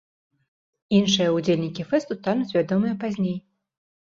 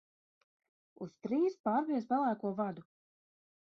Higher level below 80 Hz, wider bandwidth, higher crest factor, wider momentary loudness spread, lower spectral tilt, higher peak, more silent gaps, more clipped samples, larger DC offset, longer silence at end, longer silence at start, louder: first, -64 dBFS vs -82 dBFS; first, 7.6 kHz vs 6.8 kHz; about the same, 18 dB vs 16 dB; second, 7 LU vs 16 LU; second, -5.5 dB/octave vs -7 dB/octave; first, -6 dBFS vs -20 dBFS; second, none vs 1.60-1.64 s; neither; neither; about the same, 0.75 s vs 0.8 s; about the same, 0.9 s vs 1 s; first, -23 LUFS vs -35 LUFS